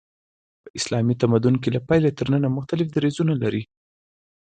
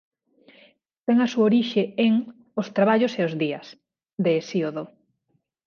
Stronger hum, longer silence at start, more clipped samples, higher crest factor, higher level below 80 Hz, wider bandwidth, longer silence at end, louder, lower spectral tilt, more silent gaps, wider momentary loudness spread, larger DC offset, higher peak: neither; second, 0.65 s vs 1.1 s; neither; about the same, 18 dB vs 18 dB; first, -54 dBFS vs -74 dBFS; first, 9.4 kHz vs 7 kHz; first, 0.95 s vs 0.8 s; about the same, -22 LUFS vs -23 LUFS; about the same, -7 dB/octave vs -6.5 dB/octave; first, 0.70-0.74 s vs none; second, 7 LU vs 13 LU; neither; about the same, -6 dBFS vs -6 dBFS